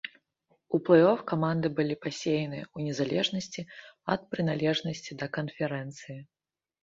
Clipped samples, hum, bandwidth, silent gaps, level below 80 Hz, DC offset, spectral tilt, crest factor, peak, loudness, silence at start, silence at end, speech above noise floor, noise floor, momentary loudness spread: under 0.1%; none; 7.8 kHz; none; -68 dBFS; under 0.1%; -6 dB/octave; 22 dB; -8 dBFS; -29 LUFS; 0.05 s; 0.6 s; 44 dB; -73 dBFS; 18 LU